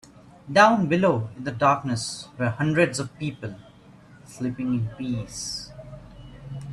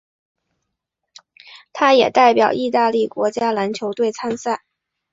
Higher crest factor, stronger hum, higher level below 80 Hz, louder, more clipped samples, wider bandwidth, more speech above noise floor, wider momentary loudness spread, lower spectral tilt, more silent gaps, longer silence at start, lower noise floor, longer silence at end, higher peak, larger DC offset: about the same, 22 dB vs 18 dB; neither; first, -54 dBFS vs -66 dBFS; second, -24 LUFS vs -17 LUFS; neither; first, 13 kHz vs 7.8 kHz; second, 26 dB vs 62 dB; first, 21 LU vs 11 LU; first, -5.5 dB/octave vs -4 dB/octave; neither; second, 0.45 s vs 1.5 s; second, -50 dBFS vs -78 dBFS; second, 0 s vs 0.55 s; about the same, -2 dBFS vs -2 dBFS; neither